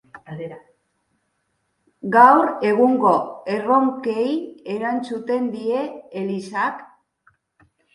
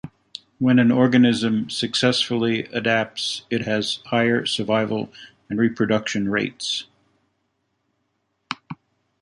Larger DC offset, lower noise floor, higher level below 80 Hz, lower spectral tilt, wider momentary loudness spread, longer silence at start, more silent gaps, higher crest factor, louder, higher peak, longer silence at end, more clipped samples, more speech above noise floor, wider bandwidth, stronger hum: neither; about the same, -71 dBFS vs -72 dBFS; second, -70 dBFS vs -60 dBFS; first, -7 dB/octave vs -5 dB/octave; first, 21 LU vs 17 LU; about the same, 0.15 s vs 0.05 s; neither; about the same, 20 dB vs 18 dB; about the same, -19 LUFS vs -21 LUFS; first, 0 dBFS vs -4 dBFS; first, 1.1 s vs 0.45 s; neither; about the same, 52 dB vs 52 dB; about the same, 11.5 kHz vs 11.5 kHz; neither